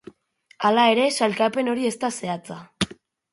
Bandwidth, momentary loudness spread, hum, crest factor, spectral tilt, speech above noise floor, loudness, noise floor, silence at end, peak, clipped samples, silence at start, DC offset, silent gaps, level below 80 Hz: 11.5 kHz; 12 LU; none; 18 dB; -4 dB/octave; 37 dB; -22 LUFS; -59 dBFS; 0.4 s; -4 dBFS; under 0.1%; 0.6 s; under 0.1%; none; -60 dBFS